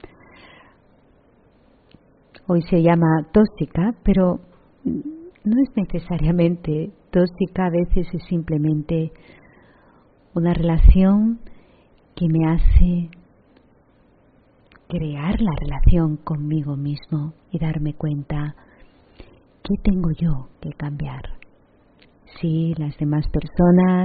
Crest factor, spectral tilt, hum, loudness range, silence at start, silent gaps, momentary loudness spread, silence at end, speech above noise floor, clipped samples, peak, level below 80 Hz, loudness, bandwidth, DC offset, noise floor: 20 dB; -9 dB/octave; none; 7 LU; 0.05 s; none; 13 LU; 0 s; 37 dB; under 0.1%; 0 dBFS; -26 dBFS; -21 LUFS; 4.8 kHz; under 0.1%; -55 dBFS